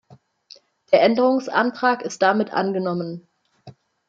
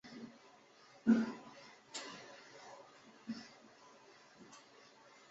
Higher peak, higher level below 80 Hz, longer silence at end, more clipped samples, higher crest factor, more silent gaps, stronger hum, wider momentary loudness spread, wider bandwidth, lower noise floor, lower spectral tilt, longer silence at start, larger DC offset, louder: first, -2 dBFS vs -18 dBFS; first, -72 dBFS vs -84 dBFS; second, 0.4 s vs 0.7 s; neither; about the same, 20 dB vs 24 dB; neither; neither; second, 10 LU vs 27 LU; about the same, 7.8 kHz vs 7.6 kHz; second, -51 dBFS vs -64 dBFS; about the same, -5.5 dB/octave vs -5 dB/octave; first, 0.9 s vs 0.05 s; neither; first, -20 LUFS vs -40 LUFS